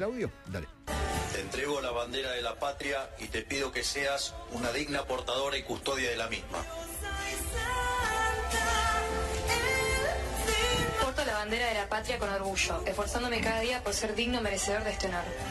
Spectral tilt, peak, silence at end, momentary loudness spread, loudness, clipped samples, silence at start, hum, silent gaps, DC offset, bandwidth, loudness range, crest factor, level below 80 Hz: -3 dB/octave; -16 dBFS; 0 s; 8 LU; -31 LUFS; under 0.1%; 0 s; none; none; under 0.1%; 15.5 kHz; 4 LU; 16 dB; -42 dBFS